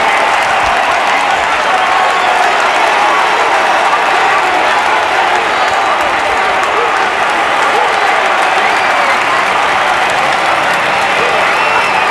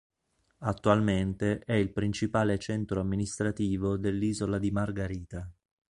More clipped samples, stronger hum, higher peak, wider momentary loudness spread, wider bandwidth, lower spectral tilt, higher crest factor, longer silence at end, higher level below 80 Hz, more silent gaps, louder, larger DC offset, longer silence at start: neither; neither; first, 0 dBFS vs -8 dBFS; second, 2 LU vs 10 LU; about the same, 12 kHz vs 11 kHz; second, -1.5 dB/octave vs -6.5 dB/octave; second, 10 dB vs 22 dB; second, 0 s vs 0.4 s; about the same, -46 dBFS vs -48 dBFS; neither; first, -10 LUFS vs -30 LUFS; neither; second, 0 s vs 0.6 s